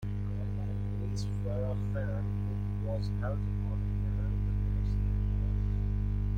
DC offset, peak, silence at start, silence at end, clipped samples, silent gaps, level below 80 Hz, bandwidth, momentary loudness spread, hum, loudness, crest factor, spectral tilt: under 0.1%; -22 dBFS; 0 s; 0 s; under 0.1%; none; -34 dBFS; 7.2 kHz; 3 LU; 50 Hz at -30 dBFS; -34 LUFS; 10 dB; -8.5 dB/octave